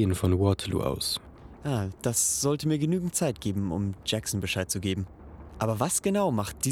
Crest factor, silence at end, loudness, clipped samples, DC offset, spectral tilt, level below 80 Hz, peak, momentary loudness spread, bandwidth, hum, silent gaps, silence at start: 18 dB; 0 s; -28 LUFS; under 0.1%; under 0.1%; -4.5 dB/octave; -50 dBFS; -10 dBFS; 8 LU; 17.5 kHz; none; none; 0 s